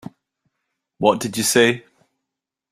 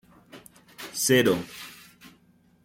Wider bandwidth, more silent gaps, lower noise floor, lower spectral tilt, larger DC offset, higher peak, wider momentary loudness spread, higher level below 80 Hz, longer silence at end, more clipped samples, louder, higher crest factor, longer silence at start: about the same, 16 kHz vs 17 kHz; neither; first, -84 dBFS vs -61 dBFS; about the same, -3 dB/octave vs -3.5 dB/octave; neither; first, -2 dBFS vs -8 dBFS; second, 5 LU vs 22 LU; first, -60 dBFS vs -66 dBFS; about the same, 0.9 s vs 0.9 s; neither; first, -18 LUFS vs -23 LUFS; about the same, 20 dB vs 20 dB; first, 1 s vs 0.35 s